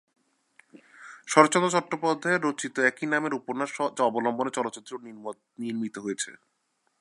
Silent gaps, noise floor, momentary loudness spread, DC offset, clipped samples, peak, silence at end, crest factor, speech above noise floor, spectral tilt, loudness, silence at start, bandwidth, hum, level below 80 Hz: none; -63 dBFS; 19 LU; under 0.1%; under 0.1%; -2 dBFS; 0.65 s; 26 dB; 36 dB; -4 dB/octave; -26 LUFS; 1 s; 11.5 kHz; none; -80 dBFS